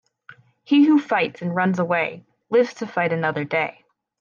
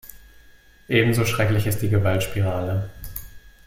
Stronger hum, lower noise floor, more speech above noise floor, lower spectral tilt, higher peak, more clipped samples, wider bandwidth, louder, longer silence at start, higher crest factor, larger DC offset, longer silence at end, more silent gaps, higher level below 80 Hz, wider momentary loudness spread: neither; about the same, -50 dBFS vs -50 dBFS; about the same, 30 dB vs 30 dB; about the same, -7 dB/octave vs -6 dB/octave; second, -8 dBFS vs -4 dBFS; neither; second, 7 kHz vs 16.5 kHz; about the same, -21 LUFS vs -22 LUFS; first, 0.3 s vs 0.05 s; second, 14 dB vs 20 dB; neither; first, 0.5 s vs 0.15 s; neither; second, -72 dBFS vs -44 dBFS; second, 8 LU vs 15 LU